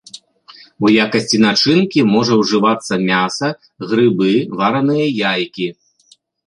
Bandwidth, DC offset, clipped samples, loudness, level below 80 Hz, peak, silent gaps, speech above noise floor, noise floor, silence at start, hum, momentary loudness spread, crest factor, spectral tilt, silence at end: 11 kHz; under 0.1%; under 0.1%; -15 LUFS; -58 dBFS; -2 dBFS; none; 39 dB; -53 dBFS; 0.15 s; none; 8 LU; 14 dB; -5 dB/octave; 0.75 s